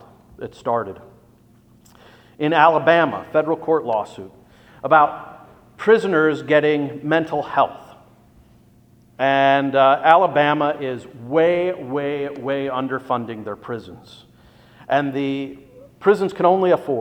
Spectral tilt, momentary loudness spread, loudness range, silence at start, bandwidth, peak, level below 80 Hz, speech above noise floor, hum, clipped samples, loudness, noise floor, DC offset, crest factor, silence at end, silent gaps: -7 dB/octave; 16 LU; 8 LU; 0.4 s; 9.4 kHz; 0 dBFS; -60 dBFS; 34 dB; none; under 0.1%; -19 LUFS; -52 dBFS; under 0.1%; 20 dB; 0 s; none